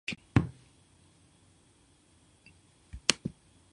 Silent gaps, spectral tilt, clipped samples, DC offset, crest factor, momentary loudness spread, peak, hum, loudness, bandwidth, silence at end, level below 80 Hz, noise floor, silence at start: none; -3.5 dB/octave; under 0.1%; under 0.1%; 36 dB; 14 LU; 0 dBFS; none; -31 LUFS; 11 kHz; 0.4 s; -52 dBFS; -64 dBFS; 0.1 s